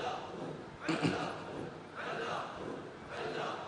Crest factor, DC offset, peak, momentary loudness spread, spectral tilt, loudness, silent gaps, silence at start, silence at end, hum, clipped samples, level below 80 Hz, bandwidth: 20 dB; under 0.1%; -20 dBFS; 10 LU; -5.5 dB/octave; -40 LUFS; none; 0 s; 0 s; none; under 0.1%; -70 dBFS; 10 kHz